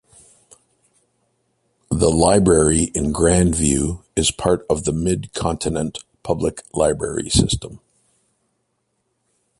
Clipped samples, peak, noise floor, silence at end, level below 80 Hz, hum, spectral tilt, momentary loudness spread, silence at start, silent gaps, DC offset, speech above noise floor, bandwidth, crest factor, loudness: under 0.1%; 0 dBFS; -71 dBFS; 1.8 s; -34 dBFS; none; -4.5 dB/octave; 11 LU; 1.9 s; none; under 0.1%; 53 dB; 11.5 kHz; 20 dB; -19 LUFS